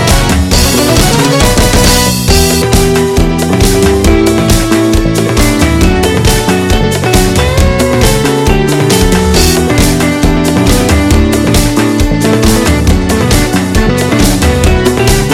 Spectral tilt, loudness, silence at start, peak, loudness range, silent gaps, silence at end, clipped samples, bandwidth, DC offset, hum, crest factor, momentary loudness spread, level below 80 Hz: -4.5 dB/octave; -8 LUFS; 0 s; 0 dBFS; 1 LU; none; 0 s; 0.4%; 17 kHz; 0.3%; none; 8 dB; 2 LU; -14 dBFS